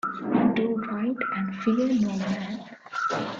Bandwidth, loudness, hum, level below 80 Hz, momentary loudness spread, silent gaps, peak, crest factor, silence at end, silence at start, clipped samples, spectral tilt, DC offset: 7.6 kHz; -26 LUFS; none; -64 dBFS; 9 LU; none; -10 dBFS; 16 dB; 0 s; 0.05 s; under 0.1%; -6.5 dB/octave; under 0.1%